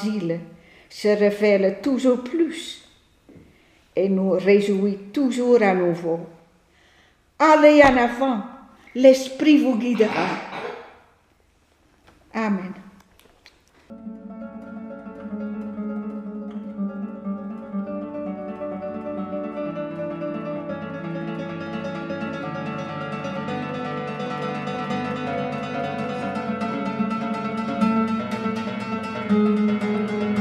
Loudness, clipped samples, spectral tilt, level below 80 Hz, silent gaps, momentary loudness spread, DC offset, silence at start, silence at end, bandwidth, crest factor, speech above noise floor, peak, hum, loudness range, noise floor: -23 LUFS; under 0.1%; -6.5 dB/octave; -56 dBFS; none; 16 LU; under 0.1%; 0 s; 0 s; 13 kHz; 24 dB; 42 dB; 0 dBFS; none; 15 LU; -60 dBFS